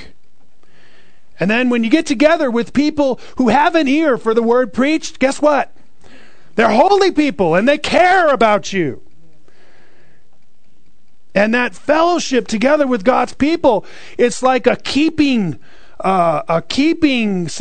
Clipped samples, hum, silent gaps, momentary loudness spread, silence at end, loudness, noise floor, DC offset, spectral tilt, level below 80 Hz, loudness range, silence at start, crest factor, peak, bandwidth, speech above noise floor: under 0.1%; none; none; 7 LU; 0 s; -14 LUFS; -59 dBFS; 4%; -5 dB/octave; -46 dBFS; 5 LU; 0 s; 16 dB; 0 dBFS; 9.4 kHz; 45 dB